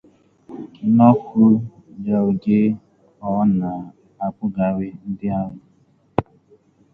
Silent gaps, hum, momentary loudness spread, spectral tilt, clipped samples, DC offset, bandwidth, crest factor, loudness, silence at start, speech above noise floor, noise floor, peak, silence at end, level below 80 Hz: none; none; 18 LU; -11.5 dB/octave; under 0.1%; under 0.1%; 3.9 kHz; 20 dB; -19 LUFS; 0.5 s; 40 dB; -57 dBFS; 0 dBFS; 0.7 s; -52 dBFS